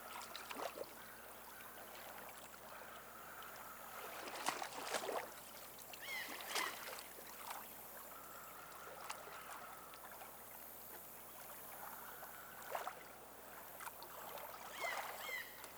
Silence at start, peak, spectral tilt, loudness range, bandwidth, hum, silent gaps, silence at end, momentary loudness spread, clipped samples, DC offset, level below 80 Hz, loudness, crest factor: 0 s; -22 dBFS; -1 dB/octave; 7 LU; over 20 kHz; none; none; 0 s; 10 LU; under 0.1%; under 0.1%; -78 dBFS; -49 LUFS; 28 dB